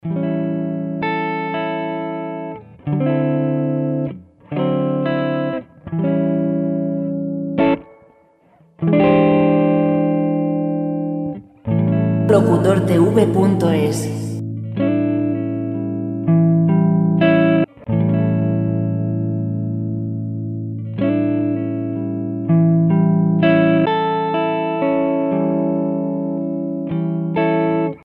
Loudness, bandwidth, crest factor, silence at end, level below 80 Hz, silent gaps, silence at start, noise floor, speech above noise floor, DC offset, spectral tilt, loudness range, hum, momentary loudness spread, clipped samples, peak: -18 LUFS; 11.5 kHz; 18 dB; 0.05 s; -54 dBFS; none; 0.05 s; -53 dBFS; 38 dB; under 0.1%; -8.5 dB/octave; 5 LU; none; 10 LU; under 0.1%; 0 dBFS